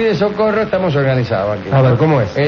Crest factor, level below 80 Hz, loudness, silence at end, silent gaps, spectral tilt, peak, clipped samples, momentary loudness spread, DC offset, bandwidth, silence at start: 12 dB; -42 dBFS; -14 LUFS; 0 s; none; -8.5 dB/octave; -2 dBFS; under 0.1%; 4 LU; under 0.1%; 6.4 kHz; 0 s